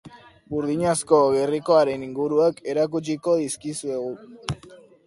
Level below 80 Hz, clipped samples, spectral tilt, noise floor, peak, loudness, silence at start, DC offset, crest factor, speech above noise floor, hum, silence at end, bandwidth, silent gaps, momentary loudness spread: -56 dBFS; under 0.1%; -5 dB/octave; -48 dBFS; -4 dBFS; -23 LUFS; 0.05 s; under 0.1%; 20 dB; 26 dB; none; 0.3 s; 11.5 kHz; none; 14 LU